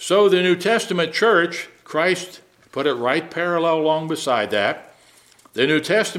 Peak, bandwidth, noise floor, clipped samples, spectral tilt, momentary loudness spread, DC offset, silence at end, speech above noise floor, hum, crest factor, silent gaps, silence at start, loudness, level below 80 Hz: -2 dBFS; 15.5 kHz; -52 dBFS; under 0.1%; -4 dB/octave; 10 LU; under 0.1%; 0 s; 33 dB; none; 18 dB; none; 0 s; -19 LUFS; -72 dBFS